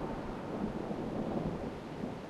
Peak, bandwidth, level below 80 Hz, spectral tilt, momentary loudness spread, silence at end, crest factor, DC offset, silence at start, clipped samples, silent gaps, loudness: -24 dBFS; 13 kHz; -52 dBFS; -7.5 dB/octave; 5 LU; 0 s; 14 dB; under 0.1%; 0 s; under 0.1%; none; -39 LUFS